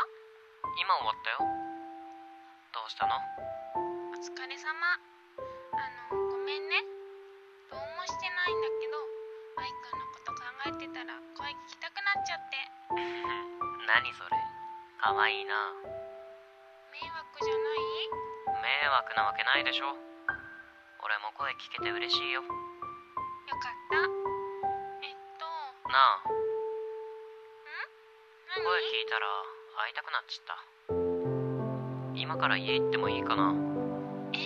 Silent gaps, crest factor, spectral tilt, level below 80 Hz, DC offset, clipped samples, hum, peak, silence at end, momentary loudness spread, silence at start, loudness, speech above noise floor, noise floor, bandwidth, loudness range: none; 26 dB; -4.5 dB/octave; -68 dBFS; under 0.1%; under 0.1%; none; -8 dBFS; 0 s; 16 LU; 0 s; -33 LUFS; 25 dB; -57 dBFS; 8 kHz; 6 LU